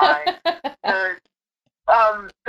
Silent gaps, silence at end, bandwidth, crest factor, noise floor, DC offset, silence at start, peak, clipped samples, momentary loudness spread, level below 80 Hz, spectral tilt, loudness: none; 0.2 s; 12.5 kHz; 18 dB; -76 dBFS; under 0.1%; 0 s; -2 dBFS; under 0.1%; 11 LU; -58 dBFS; -3.5 dB/octave; -20 LUFS